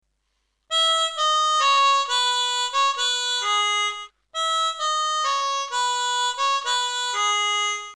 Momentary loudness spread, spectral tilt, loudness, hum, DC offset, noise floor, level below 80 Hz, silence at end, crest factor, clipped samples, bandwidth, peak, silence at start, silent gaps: 6 LU; 4.5 dB/octave; -21 LUFS; none; under 0.1%; -73 dBFS; -70 dBFS; 0 s; 14 dB; under 0.1%; 13.5 kHz; -10 dBFS; 0.7 s; none